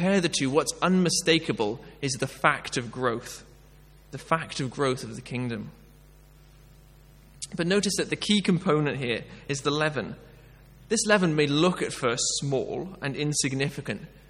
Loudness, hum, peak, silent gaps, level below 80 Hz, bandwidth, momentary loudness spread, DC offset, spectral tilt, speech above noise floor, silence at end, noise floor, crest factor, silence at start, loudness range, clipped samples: -26 LUFS; none; -4 dBFS; none; -56 dBFS; 15 kHz; 13 LU; under 0.1%; -4 dB/octave; 26 dB; 0.1 s; -53 dBFS; 24 dB; 0 s; 7 LU; under 0.1%